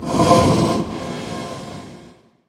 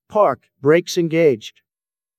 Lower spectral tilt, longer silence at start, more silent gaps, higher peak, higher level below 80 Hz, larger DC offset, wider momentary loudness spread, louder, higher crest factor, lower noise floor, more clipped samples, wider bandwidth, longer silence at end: about the same, -6 dB/octave vs -5.5 dB/octave; about the same, 0 s vs 0.1 s; neither; about the same, 0 dBFS vs -2 dBFS; first, -42 dBFS vs -66 dBFS; neither; first, 21 LU vs 9 LU; about the same, -18 LUFS vs -18 LUFS; about the same, 20 dB vs 16 dB; second, -46 dBFS vs under -90 dBFS; neither; about the same, 16.5 kHz vs 16 kHz; second, 0.4 s vs 0.7 s